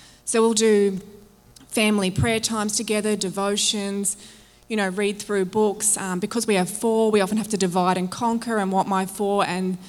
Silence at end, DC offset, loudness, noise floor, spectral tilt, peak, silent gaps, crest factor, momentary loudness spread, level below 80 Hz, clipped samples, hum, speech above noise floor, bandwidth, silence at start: 0 s; under 0.1%; -22 LUFS; -50 dBFS; -4 dB/octave; -6 dBFS; none; 16 dB; 6 LU; -56 dBFS; under 0.1%; none; 28 dB; 17.5 kHz; 0.25 s